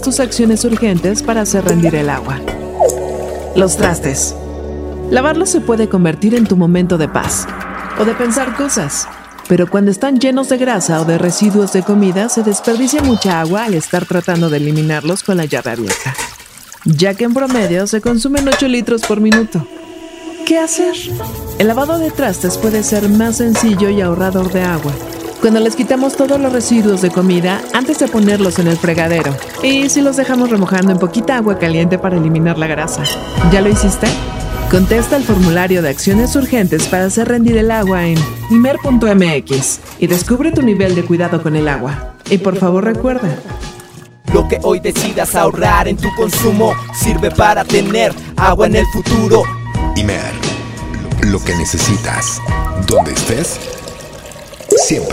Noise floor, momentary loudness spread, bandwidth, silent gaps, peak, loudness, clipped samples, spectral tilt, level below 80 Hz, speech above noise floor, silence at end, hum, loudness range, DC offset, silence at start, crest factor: -35 dBFS; 9 LU; 16.5 kHz; none; 0 dBFS; -13 LUFS; under 0.1%; -5 dB/octave; -28 dBFS; 23 dB; 0 s; none; 3 LU; under 0.1%; 0 s; 12 dB